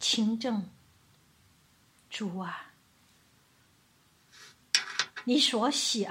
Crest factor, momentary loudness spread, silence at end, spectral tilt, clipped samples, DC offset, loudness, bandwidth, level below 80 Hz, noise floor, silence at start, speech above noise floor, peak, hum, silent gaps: 26 dB; 15 LU; 0 s; -2.5 dB/octave; under 0.1%; under 0.1%; -29 LUFS; 16 kHz; -76 dBFS; -65 dBFS; 0 s; 35 dB; -8 dBFS; none; none